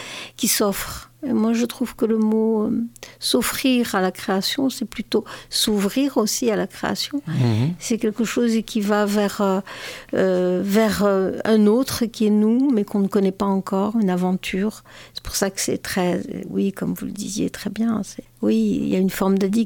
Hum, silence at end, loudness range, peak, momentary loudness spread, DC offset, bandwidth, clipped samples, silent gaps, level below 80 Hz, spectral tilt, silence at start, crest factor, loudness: none; 0 s; 5 LU; -4 dBFS; 8 LU; under 0.1%; 18 kHz; under 0.1%; none; -50 dBFS; -5 dB/octave; 0 s; 16 dB; -21 LUFS